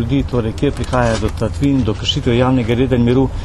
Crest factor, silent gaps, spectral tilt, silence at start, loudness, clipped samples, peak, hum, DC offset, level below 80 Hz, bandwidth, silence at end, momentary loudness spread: 14 dB; none; -6.5 dB/octave; 0 s; -16 LUFS; under 0.1%; 0 dBFS; none; under 0.1%; -26 dBFS; 12 kHz; 0 s; 5 LU